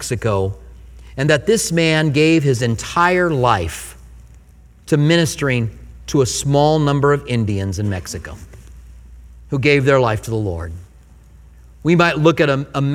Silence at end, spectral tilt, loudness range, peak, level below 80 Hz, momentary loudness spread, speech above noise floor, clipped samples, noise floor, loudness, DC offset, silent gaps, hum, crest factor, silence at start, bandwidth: 0 s; -5.5 dB/octave; 4 LU; 0 dBFS; -40 dBFS; 15 LU; 29 dB; under 0.1%; -45 dBFS; -16 LUFS; under 0.1%; none; none; 18 dB; 0 s; 16 kHz